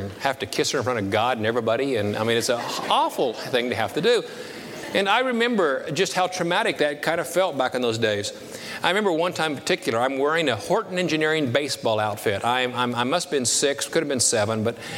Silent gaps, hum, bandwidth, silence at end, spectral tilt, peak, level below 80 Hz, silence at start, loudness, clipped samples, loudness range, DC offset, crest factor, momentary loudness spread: none; none; 18 kHz; 0 s; -3.5 dB/octave; -4 dBFS; -66 dBFS; 0 s; -23 LUFS; under 0.1%; 1 LU; under 0.1%; 20 dB; 5 LU